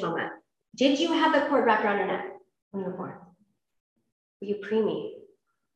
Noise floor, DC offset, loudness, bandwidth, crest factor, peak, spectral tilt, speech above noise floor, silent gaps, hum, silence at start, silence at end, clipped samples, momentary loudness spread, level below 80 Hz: -67 dBFS; under 0.1%; -26 LUFS; 9 kHz; 20 dB; -8 dBFS; -5 dB/octave; 41 dB; 2.62-2.71 s, 3.80-3.96 s, 4.12-4.40 s; none; 0 s; 0.55 s; under 0.1%; 18 LU; -78 dBFS